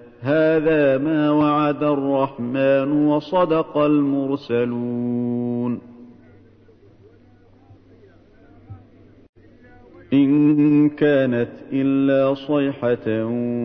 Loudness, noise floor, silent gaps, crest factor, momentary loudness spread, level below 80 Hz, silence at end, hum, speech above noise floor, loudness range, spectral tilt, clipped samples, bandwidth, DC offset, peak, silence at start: -19 LUFS; -51 dBFS; 9.29-9.33 s; 14 dB; 7 LU; -56 dBFS; 0 s; none; 32 dB; 10 LU; -10 dB/octave; under 0.1%; 5.4 kHz; under 0.1%; -6 dBFS; 0 s